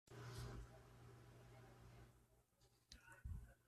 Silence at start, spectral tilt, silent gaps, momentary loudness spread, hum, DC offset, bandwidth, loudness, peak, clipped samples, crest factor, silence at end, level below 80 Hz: 0.05 s; -5 dB/octave; none; 11 LU; none; under 0.1%; 13.5 kHz; -60 LUFS; -42 dBFS; under 0.1%; 18 dB; 0 s; -64 dBFS